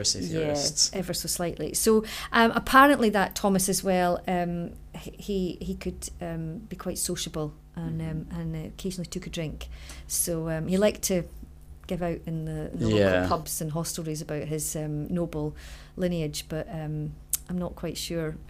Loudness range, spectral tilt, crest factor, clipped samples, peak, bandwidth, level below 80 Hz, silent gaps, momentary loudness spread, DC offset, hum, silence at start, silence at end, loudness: 10 LU; -4 dB/octave; 24 dB; under 0.1%; -4 dBFS; 16 kHz; -46 dBFS; none; 13 LU; under 0.1%; none; 0 s; 0 s; -27 LUFS